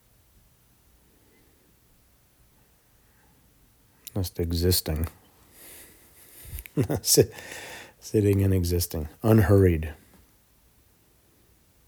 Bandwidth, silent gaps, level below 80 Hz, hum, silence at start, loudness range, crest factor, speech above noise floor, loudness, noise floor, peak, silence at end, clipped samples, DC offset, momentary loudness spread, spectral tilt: over 20 kHz; none; -46 dBFS; none; 4.15 s; 8 LU; 22 dB; 38 dB; -24 LUFS; -61 dBFS; -4 dBFS; 1.95 s; under 0.1%; under 0.1%; 23 LU; -5 dB/octave